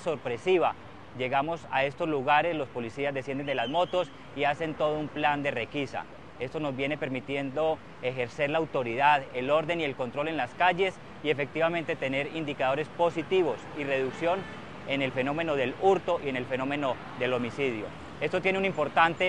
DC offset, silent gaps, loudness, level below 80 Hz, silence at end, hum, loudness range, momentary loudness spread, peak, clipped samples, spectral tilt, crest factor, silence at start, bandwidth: 0.3%; none; -29 LUFS; -62 dBFS; 0 s; none; 3 LU; 8 LU; -6 dBFS; under 0.1%; -6 dB/octave; 22 dB; 0 s; 11 kHz